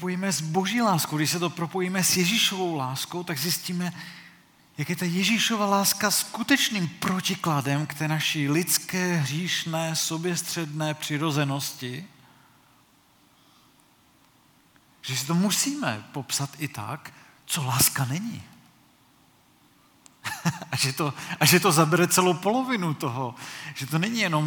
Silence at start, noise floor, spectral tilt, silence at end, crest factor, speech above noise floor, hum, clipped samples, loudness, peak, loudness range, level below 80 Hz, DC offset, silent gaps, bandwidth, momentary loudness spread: 0 s; -60 dBFS; -3.5 dB/octave; 0 s; 22 dB; 35 dB; none; under 0.1%; -25 LUFS; -4 dBFS; 9 LU; -68 dBFS; under 0.1%; none; 19.5 kHz; 14 LU